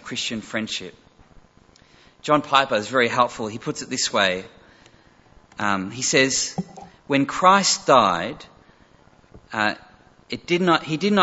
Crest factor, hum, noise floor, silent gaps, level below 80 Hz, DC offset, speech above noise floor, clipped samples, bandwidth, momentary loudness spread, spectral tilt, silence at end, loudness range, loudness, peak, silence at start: 22 dB; none; -54 dBFS; none; -58 dBFS; under 0.1%; 33 dB; under 0.1%; 8.2 kHz; 17 LU; -3 dB/octave; 0 s; 4 LU; -21 LUFS; -2 dBFS; 0.05 s